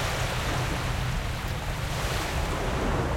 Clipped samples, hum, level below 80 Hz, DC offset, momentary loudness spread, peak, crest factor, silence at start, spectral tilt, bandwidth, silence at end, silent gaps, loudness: under 0.1%; none; -34 dBFS; under 0.1%; 3 LU; -16 dBFS; 12 dB; 0 s; -4.5 dB/octave; 16.5 kHz; 0 s; none; -29 LUFS